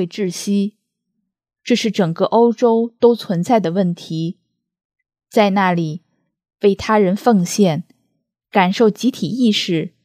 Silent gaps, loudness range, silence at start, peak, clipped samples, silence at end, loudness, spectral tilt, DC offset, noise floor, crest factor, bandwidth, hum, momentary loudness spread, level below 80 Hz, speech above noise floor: 4.85-4.90 s; 3 LU; 0 s; 0 dBFS; under 0.1%; 0.15 s; -17 LUFS; -5.5 dB/octave; under 0.1%; -74 dBFS; 18 dB; 15 kHz; none; 10 LU; -58 dBFS; 58 dB